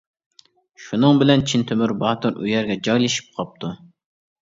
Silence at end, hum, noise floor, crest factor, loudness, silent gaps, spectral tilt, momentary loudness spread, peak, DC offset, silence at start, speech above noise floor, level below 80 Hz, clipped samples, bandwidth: 0.65 s; none; -53 dBFS; 20 dB; -19 LUFS; none; -5.5 dB/octave; 16 LU; 0 dBFS; under 0.1%; 0.8 s; 34 dB; -54 dBFS; under 0.1%; 7.8 kHz